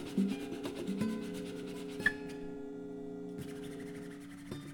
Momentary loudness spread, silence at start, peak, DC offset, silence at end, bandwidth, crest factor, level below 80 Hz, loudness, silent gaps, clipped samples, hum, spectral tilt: 12 LU; 0 s; -16 dBFS; under 0.1%; 0 s; 18.5 kHz; 24 dB; -64 dBFS; -40 LUFS; none; under 0.1%; none; -5.5 dB/octave